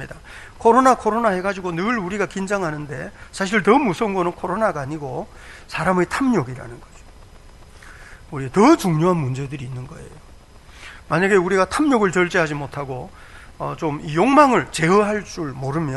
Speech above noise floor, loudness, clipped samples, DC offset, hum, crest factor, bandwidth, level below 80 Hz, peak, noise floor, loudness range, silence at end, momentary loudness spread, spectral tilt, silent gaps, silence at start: 24 dB; -19 LUFS; under 0.1%; under 0.1%; none; 20 dB; 12 kHz; -46 dBFS; 0 dBFS; -44 dBFS; 5 LU; 0 s; 19 LU; -6 dB/octave; none; 0 s